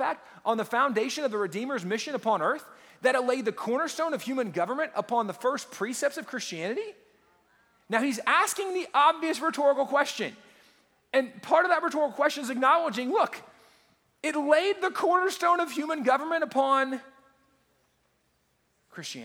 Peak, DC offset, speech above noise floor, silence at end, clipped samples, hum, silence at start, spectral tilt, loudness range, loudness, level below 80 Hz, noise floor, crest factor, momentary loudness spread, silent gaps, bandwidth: -8 dBFS; under 0.1%; 44 dB; 0 s; under 0.1%; none; 0 s; -3.5 dB/octave; 4 LU; -27 LUFS; -82 dBFS; -71 dBFS; 20 dB; 10 LU; none; 19 kHz